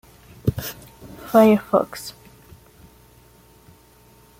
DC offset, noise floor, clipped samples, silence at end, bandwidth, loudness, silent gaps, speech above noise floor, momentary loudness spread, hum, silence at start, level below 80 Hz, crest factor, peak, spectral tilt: under 0.1%; -52 dBFS; under 0.1%; 2.3 s; 16.5 kHz; -20 LUFS; none; 34 dB; 25 LU; none; 0.45 s; -50 dBFS; 20 dB; -2 dBFS; -6.5 dB/octave